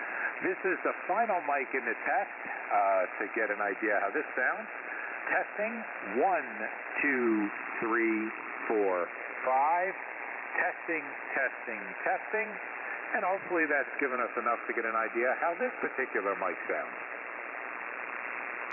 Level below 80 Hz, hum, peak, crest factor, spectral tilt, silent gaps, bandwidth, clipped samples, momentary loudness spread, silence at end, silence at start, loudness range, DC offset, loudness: -88 dBFS; none; -16 dBFS; 16 dB; -8.5 dB/octave; none; 3.1 kHz; under 0.1%; 9 LU; 0 s; 0 s; 2 LU; under 0.1%; -32 LUFS